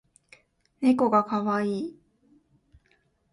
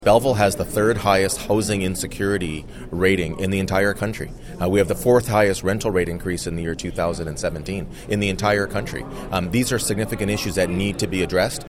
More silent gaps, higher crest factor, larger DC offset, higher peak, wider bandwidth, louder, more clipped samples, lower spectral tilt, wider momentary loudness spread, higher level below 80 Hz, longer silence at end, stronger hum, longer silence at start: neither; about the same, 18 dB vs 18 dB; neither; second, -10 dBFS vs -2 dBFS; second, 11 kHz vs 17 kHz; second, -25 LUFS vs -21 LUFS; neither; first, -7.5 dB/octave vs -5 dB/octave; about the same, 11 LU vs 9 LU; second, -68 dBFS vs -38 dBFS; first, 1.4 s vs 0 s; neither; first, 0.8 s vs 0 s